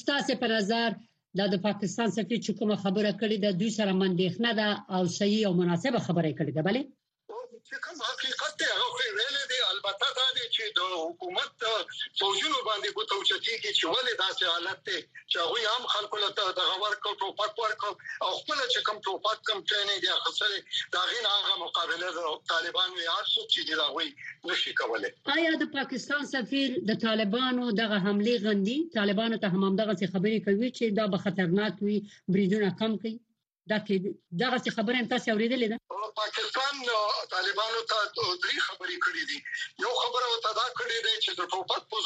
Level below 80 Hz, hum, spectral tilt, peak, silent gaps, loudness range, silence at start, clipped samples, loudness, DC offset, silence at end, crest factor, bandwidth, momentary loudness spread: -78 dBFS; none; -4 dB/octave; -12 dBFS; none; 2 LU; 0.05 s; under 0.1%; -28 LUFS; under 0.1%; 0 s; 16 dB; 9.2 kHz; 6 LU